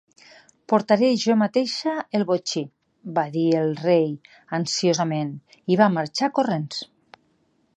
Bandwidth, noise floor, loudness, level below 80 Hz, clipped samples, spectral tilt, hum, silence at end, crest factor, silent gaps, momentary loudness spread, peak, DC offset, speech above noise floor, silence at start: 9.8 kHz; -66 dBFS; -22 LUFS; -72 dBFS; under 0.1%; -5 dB/octave; none; 0.9 s; 20 dB; none; 13 LU; -2 dBFS; under 0.1%; 44 dB; 0.7 s